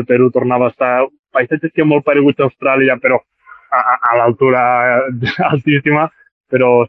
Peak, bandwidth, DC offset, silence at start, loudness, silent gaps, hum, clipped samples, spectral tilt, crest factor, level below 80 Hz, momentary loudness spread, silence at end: 0 dBFS; 6 kHz; under 0.1%; 0 s; -13 LUFS; 1.19-1.23 s, 6.31-6.44 s; none; under 0.1%; -9 dB/octave; 12 dB; -54 dBFS; 5 LU; 0 s